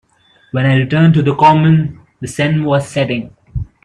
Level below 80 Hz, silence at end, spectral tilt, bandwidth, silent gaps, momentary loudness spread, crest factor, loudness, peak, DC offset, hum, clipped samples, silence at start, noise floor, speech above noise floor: -40 dBFS; 0.2 s; -7 dB/octave; 11 kHz; none; 16 LU; 14 dB; -13 LUFS; 0 dBFS; under 0.1%; none; under 0.1%; 0.55 s; -52 dBFS; 40 dB